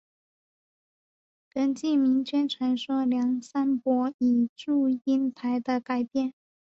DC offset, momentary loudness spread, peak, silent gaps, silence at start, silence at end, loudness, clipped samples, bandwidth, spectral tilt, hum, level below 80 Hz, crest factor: under 0.1%; 5 LU; -14 dBFS; 4.14-4.19 s, 4.49-4.56 s; 1.55 s; 0.4 s; -27 LUFS; under 0.1%; 7.8 kHz; -5.5 dB/octave; none; -74 dBFS; 12 dB